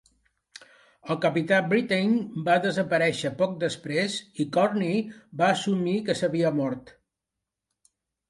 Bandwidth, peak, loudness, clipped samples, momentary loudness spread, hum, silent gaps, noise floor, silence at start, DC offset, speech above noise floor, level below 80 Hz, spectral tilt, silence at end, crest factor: 11.5 kHz; -8 dBFS; -25 LUFS; under 0.1%; 7 LU; none; none; -86 dBFS; 1.05 s; under 0.1%; 61 dB; -68 dBFS; -5.5 dB/octave; 1.4 s; 18 dB